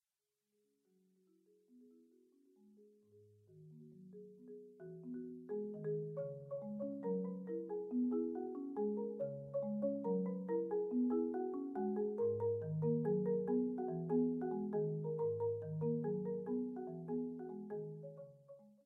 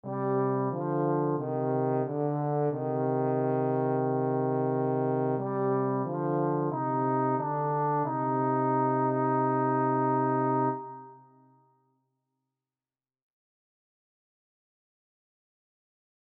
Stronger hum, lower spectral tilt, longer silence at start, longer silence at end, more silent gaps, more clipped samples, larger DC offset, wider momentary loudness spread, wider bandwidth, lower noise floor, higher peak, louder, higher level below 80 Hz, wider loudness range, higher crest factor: neither; about the same, -12.5 dB/octave vs -13 dB/octave; first, 1.75 s vs 0.05 s; second, 0.15 s vs 5.2 s; neither; neither; neither; first, 18 LU vs 3 LU; second, 2.1 kHz vs 3.1 kHz; about the same, under -90 dBFS vs under -90 dBFS; second, -26 dBFS vs -16 dBFS; second, -41 LUFS vs -28 LUFS; about the same, -84 dBFS vs -82 dBFS; first, 11 LU vs 4 LU; about the same, 16 dB vs 14 dB